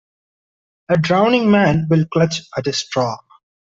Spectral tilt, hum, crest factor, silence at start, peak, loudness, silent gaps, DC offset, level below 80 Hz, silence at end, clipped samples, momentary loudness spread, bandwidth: -6 dB/octave; none; 16 dB; 0.9 s; -2 dBFS; -17 LUFS; none; under 0.1%; -50 dBFS; 0.55 s; under 0.1%; 9 LU; 7.8 kHz